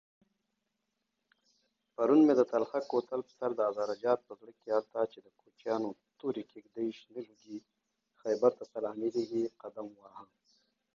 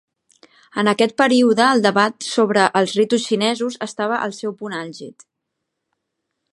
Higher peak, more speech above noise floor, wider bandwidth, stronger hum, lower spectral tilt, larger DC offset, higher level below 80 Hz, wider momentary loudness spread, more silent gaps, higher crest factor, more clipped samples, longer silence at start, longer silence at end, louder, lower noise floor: second, -14 dBFS vs 0 dBFS; second, 52 dB vs 60 dB; second, 7.2 kHz vs 11.5 kHz; neither; first, -7 dB/octave vs -4 dB/octave; neither; second, -84 dBFS vs -72 dBFS; first, 20 LU vs 14 LU; neither; about the same, 20 dB vs 18 dB; neither; first, 2 s vs 0.75 s; second, 0.75 s vs 1.4 s; second, -33 LUFS vs -18 LUFS; first, -84 dBFS vs -78 dBFS